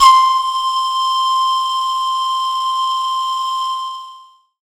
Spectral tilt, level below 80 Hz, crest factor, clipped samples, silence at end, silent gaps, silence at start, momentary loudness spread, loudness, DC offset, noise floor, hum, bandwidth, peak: 4 dB/octave; -56 dBFS; 16 dB; under 0.1%; 0.45 s; none; 0 s; 7 LU; -16 LUFS; under 0.1%; -42 dBFS; none; 17 kHz; 0 dBFS